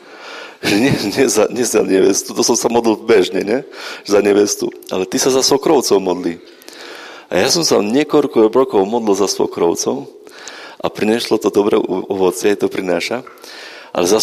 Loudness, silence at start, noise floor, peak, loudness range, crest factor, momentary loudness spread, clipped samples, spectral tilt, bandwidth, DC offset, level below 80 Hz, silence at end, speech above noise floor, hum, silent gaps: -15 LUFS; 0.05 s; -34 dBFS; 0 dBFS; 3 LU; 14 dB; 19 LU; under 0.1%; -3.5 dB/octave; 15.5 kHz; under 0.1%; -54 dBFS; 0 s; 20 dB; none; none